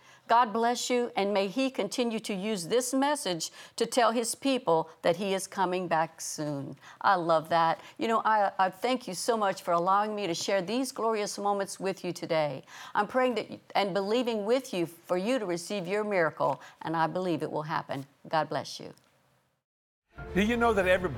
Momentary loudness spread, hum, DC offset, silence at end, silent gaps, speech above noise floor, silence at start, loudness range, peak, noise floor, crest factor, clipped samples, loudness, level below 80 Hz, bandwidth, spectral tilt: 8 LU; none; under 0.1%; 0 s; 19.64-20.02 s; 41 dB; 0.3 s; 4 LU; -10 dBFS; -69 dBFS; 20 dB; under 0.1%; -29 LUFS; -60 dBFS; 18.5 kHz; -4 dB/octave